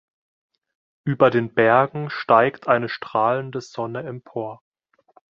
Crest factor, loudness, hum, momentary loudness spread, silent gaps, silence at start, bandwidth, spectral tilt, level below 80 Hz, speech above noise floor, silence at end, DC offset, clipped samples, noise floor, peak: 20 dB; -21 LUFS; none; 14 LU; none; 1.05 s; 7.4 kHz; -7 dB/octave; -64 dBFS; 38 dB; 0.85 s; under 0.1%; under 0.1%; -58 dBFS; -2 dBFS